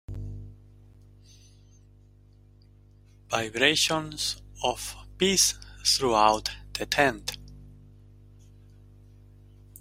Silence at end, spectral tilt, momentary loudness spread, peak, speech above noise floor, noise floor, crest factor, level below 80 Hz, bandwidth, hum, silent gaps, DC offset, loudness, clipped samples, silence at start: 0.05 s; -2 dB/octave; 17 LU; -4 dBFS; 30 dB; -55 dBFS; 26 dB; -50 dBFS; 16 kHz; 50 Hz at -50 dBFS; none; under 0.1%; -25 LUFS; under 0.1%; 0.1 s